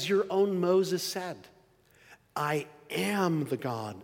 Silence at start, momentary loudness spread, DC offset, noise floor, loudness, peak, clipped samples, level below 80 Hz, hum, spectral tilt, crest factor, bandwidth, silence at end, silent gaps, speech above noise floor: 0 s; 11 LU; under 0.1%; -62 dBFS; -30 LUFS; -16 dBFS; under 0.1%; -76 dBFS; none; -5 dB/octave; 16 dB; 17 kHz; 0 s; none; 33 dB